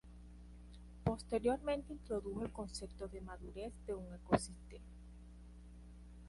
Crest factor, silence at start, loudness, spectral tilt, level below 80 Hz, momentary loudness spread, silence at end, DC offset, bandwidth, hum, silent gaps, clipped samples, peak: 26 dB; 0.05 s; -42 LUFS; -6 dB/octave; -54 dBFS; 21 LU; 0 s; under 0.1%; 11.5 kHz; 60 Hz at -55 dBFS; none; under 0.1%; -16 dBFS